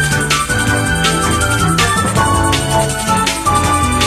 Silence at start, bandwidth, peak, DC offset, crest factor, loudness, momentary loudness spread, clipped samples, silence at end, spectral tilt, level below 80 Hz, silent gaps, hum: 0 s; 14.5 kHz; 0 dBFS; under 0.1%; 14 dB; -13 LUFS; 2 LU; under 0.1%; 0 s; -3.5 dB/octave; -26 dBFS; none; none